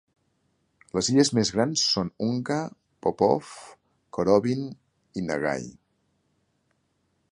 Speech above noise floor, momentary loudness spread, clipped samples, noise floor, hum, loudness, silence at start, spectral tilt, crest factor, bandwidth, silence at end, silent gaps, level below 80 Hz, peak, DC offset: 47 dB; 17 LU; under 0.1%; -72 dBFS; none; -25 LUFS; 0.95 s; -4.5 dB/octave; 22 dB; 11.5 kHz; 1.6 s; none; -60 dBFS; -6 dBFS; under 0.1%